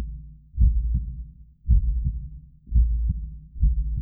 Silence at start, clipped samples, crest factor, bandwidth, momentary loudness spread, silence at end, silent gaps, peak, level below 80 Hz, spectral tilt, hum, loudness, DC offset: 0 s; under 0.1%; 16 dB; 0.4 kHz; 18 LU; 0 s; none; -8 dBFS; -24 dBFS; -15.5 dB/octave; none; -26 LUFS; under 0.1%